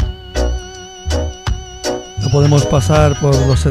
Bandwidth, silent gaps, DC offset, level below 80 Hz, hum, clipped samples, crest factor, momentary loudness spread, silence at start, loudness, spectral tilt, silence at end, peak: 13.5 kHz; none; under 0.1%; -22 dBFS; none; under 0.1%; 14 dB; 12 LU; 0 s; -15 LUFS; -6 dB/octave; 0 s; 0 dBFS